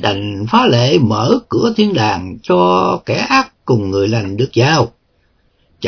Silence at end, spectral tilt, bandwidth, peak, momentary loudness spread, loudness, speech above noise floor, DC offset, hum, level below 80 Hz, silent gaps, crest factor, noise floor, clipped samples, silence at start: 0 s; -6 dB/octave; 5.4 kHz; 0 dBFS; 6 LU; -14 LUFS; 44 dB; under 0.1%; none; -48 dBFS; none; 14 dB; -58 dBFS; under 0.1%; 0 s